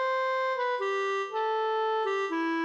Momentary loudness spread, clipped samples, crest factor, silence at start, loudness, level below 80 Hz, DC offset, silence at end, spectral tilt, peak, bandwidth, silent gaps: 2 LU; under 0.1%; 8 dB; 0 s; -29 LUFS; -82 dBFS; under 0.1%; 0 s; -1.5 dB/octave; -20 dBFS; 8.2 kHz; none